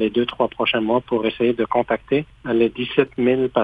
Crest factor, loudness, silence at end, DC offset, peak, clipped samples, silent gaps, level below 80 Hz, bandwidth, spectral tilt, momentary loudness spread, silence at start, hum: 18 dB; -20 LUFS; 0 s; under 0.1%; -2 dBFS; under 0.1%; none; -50 dBFS; 4.9 kHz; -8 dB/octave; 4 LU; 0 s; none